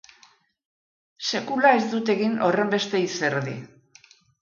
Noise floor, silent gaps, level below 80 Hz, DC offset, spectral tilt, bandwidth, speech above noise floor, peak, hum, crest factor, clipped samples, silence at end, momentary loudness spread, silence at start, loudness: -58 dBFS; none; -72 dBFS; under 0.1%; -4.5 dB/octave; 7.4 kHz; 35 dB; -4 dBFS; none; 22 dB; under 0.1%; 0.75 s; 11 LU; 1.2 s; -23 LUFS